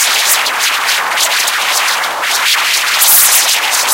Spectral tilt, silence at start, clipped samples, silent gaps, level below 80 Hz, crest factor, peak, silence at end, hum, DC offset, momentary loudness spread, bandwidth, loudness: 3.5 dB/octave; 0 s; 0.3%; none; -58 dBFS; 12 dB; 0 dBFS; 0 s; none; under 0.1%; 7 LU; over 20 kHz; -9 LUFS